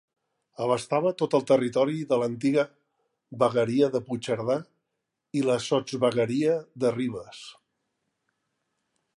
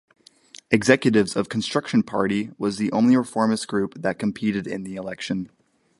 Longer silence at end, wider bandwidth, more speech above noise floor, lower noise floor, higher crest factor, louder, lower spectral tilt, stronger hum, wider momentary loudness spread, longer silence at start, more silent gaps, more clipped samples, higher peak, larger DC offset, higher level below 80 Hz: first, 1.65 s vs 0.5 s; about the same, 11.5 kHz vs 11.5 kHz; first, 57 dB vs 27 dB; first, -82 dBFS vs -49 dBFS; about the same, 18 dB vs 22 dB; second, -26 LUFS vs -23 LUFS; about the same, -6 dB/octave vs -5.5 dB/octave; neither; about the same, 10 LU vs 12 LU; about the same, 0.6 s vs 0.7 s; neither; neither; second, -8 dBFS vs -2 dBFS; neither; second, -70 dBFS vs -60 dBFS